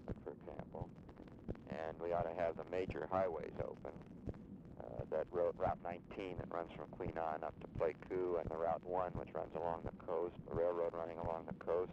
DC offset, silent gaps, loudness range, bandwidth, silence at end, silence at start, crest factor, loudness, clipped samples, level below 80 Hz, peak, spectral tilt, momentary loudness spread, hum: under 0.1%; none; 3 LU; 7.6 kHz; 0 s; 0 s; 18 dB; -43 LUFS; under 0.1%; -62 dBFS; -24 dBFS; -8.5 dB/octave; 12 LU; none